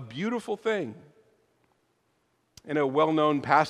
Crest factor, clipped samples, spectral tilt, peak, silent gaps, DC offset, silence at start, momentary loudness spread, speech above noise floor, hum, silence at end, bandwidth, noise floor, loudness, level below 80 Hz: 22 dB; under 0.1%; -6 dB/octave; -6 dBFS; none; under 0.1%; 0 s; 9 LU; 46 dB; none; 0 s; 12 kHz; -72 dBFS; -27 LUFS; -72 dBFS